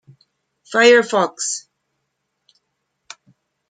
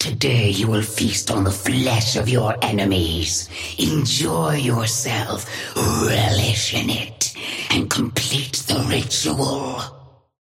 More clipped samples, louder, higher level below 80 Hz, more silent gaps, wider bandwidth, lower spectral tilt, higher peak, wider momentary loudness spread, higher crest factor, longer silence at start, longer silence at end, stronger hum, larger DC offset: neither; first, -16 LUFS vs -20 LUFS; second, -74 dBFS vs -42 dBFS; neither; second, 9.4 kHz vs 16.5 kHz; second, -2 dB/octave vs -4 dB/octave; about the same, -2 dBFS vs -4 dBFS; first, 12 LU vs 5 LU; about the same, 20 dB vs 18 dB; first, 0.7 s vs 0 s; first, 2.1 s vs 0.35 s; neither; neither